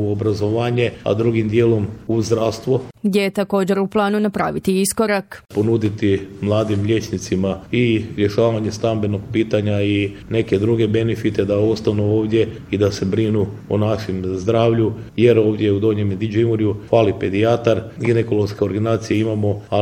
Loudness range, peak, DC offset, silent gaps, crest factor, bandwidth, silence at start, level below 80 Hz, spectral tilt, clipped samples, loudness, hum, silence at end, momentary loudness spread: 2 LU; 0 dBFS; under 0.1%; none; 18 dB; 16.5 kHz; 0 s; -48 dBFS; -6.5 dB/octave; under 0.1%; -19 LUFS; none; 0 s; 5 LU